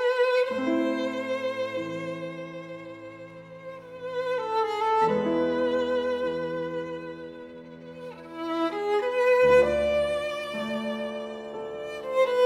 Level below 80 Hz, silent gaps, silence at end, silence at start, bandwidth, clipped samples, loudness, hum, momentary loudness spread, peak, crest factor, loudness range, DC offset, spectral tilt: -58 dBFS; none; 0 s; 0 s; 11 kHz; under 0.1%; -27 LUFS; none; 18 LU; -10 dBFS; 18 dB; 8 LU; under 0.1%; -5.5 dB/octave